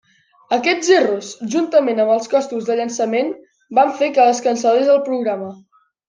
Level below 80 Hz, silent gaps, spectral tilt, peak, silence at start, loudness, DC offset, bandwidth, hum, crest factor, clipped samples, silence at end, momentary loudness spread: -70 dBFS; none; -3.5 dB/octave; -2 dBFS; 0.5 s; -17 LUFS; under 0.1%; 10 kHz; none; 16 dB; under 0.1%; 0.55 s; 9 LU